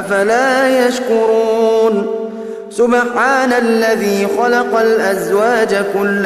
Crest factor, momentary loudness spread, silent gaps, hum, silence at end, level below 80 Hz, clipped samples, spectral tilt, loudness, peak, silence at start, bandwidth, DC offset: 12 dB; 5 LU; none; none; 0 s; -58 dBFS; under 0.1%; -4.5 dB/octave; -13 LUFS; 0 dBFS; 0 s; 14 kHz; under 0.1%